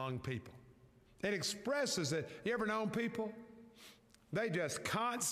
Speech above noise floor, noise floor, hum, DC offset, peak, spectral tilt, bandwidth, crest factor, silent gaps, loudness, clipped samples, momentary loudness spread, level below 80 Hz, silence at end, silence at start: 26 dB; -65 dBFS; none; under 0.1%; -24 dBFS; -3.5 dB/octave; 15.5 kHz; 16 dB; none; -39 LUFS; under 0.1%; 21 LU; -72 dBFS; 0 s; 0 s